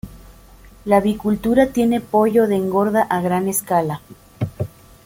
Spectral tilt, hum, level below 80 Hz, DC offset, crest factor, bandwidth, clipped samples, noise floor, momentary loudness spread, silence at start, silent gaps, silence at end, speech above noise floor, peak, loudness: -6 dB/octave; none; -46 dBFS; under 0.1%; 16 dB; 17 kHz; under 0.1%; -44 dBFS; 14 LU; 0.05 s; none; 0.4 s; 27 dB; -2 dBFS; -18 LUFS